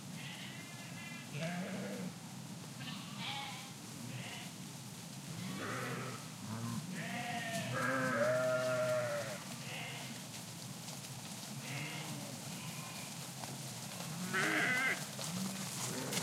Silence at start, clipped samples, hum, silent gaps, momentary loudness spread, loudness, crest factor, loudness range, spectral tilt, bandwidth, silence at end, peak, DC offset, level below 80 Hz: 0 s; under 0.1%; none; none; 13 LU; -40 LUFS; 20 dB; 8 LU; -3.5 dB/octave; 16 kHz; 0 s; -22 dBFS; under 0.1%; -78 dBFS